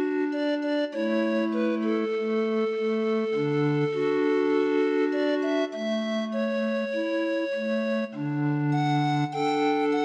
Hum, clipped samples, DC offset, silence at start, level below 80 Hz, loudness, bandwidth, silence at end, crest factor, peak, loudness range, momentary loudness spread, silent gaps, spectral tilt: none; under 0.1%; under 0.1%; 0 s; -76 dBFS; -26 LUFS; 8.6 kHz; 0 s; 12 dB; -14 dBFS; 2 LU; 4 LU; none; -7 dB/octave